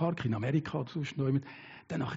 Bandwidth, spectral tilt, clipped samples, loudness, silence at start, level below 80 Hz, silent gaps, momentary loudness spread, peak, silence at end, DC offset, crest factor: 7.6 kHz; -7 dB/octave; under 0.1%; -34 LUFS; 0 s; -66 dBFS; none; 11 LU; -18 dBFS; 0 s; under 0.1%; 16 dB